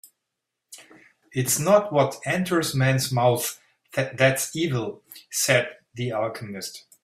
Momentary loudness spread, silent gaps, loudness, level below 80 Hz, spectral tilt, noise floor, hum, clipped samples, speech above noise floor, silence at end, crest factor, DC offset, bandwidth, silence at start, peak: 14 LU; none; -23 LUFS; -62 dBFS; -4 dB/octave; -82 dBFS; none; under 0.1%; 59 dB; 0.25 s; 20 dB; under 0.1%; 16 kHz; 0.7 s; -4 dBFS